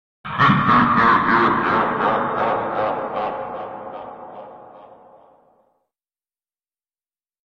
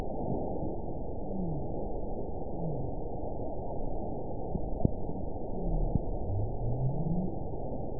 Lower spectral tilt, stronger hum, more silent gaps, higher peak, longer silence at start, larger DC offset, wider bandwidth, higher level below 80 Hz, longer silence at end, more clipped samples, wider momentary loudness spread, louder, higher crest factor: second, -7.5 dB/octave vs -16.5 dB/octave; neither; neither; first, -4 dBFS vs -10 dBFS; first, 0.25 s vs 0 s; second, under 0.1% vs 2%; first, 7.2 kHz vs 1 kHz; second, -54 dBFS vs -38 dBFS; first, 2.6 s vs 0 s; neither; first, 20 LU vs 6 LU; first, -18 LUFS vs -36 LUFS; second, 18 dB vs 24 dB